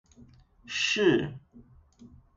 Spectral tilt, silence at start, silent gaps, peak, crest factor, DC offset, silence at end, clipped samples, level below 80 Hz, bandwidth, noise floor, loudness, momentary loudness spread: -4 dB/octave; 0.2 s; none; -12 dBFS; 20 dB; under 0.1%; 0.3 s; under 0.1%; -60 dBFS; 8 kHz; -56 dBFS; -27 LUFS; 16 LU